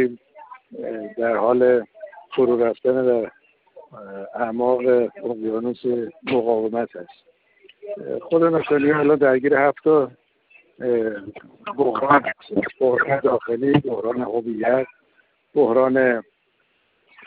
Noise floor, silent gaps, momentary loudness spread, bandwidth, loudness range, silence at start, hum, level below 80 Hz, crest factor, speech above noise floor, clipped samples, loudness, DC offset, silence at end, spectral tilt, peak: -66 dBFS; none; 16 LU; 4.6 kHz; 4 LU; 0 s; none; -64 dBFS; 18 dB; 46 dB; under 0.1%; -20 LUFS; under 0.1%; 1.05 s; -10 dB/octave; -4 dBFS